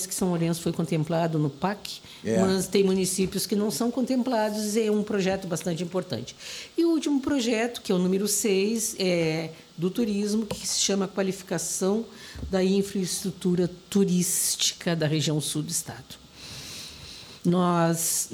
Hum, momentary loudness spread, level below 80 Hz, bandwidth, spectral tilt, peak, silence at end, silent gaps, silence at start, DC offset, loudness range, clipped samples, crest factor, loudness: none; 14 LU; -56 dBFS; 19 kHz; -4.5 dB/octave; -8 dBFS; 0 s; none; 0 s; under 0.1%; 2 LU; under 0.1%; 18 dB; -26 LUFS